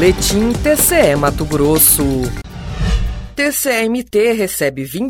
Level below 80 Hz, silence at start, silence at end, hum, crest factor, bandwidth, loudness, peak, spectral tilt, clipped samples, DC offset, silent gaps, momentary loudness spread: -26 dBFS; 0 s; 0 s; none; 14 dB; 19 kHz; -14 LUFS; 0 dBFS; -4 dB/octave; under 0.1%; under 0.1%; none; 12 LU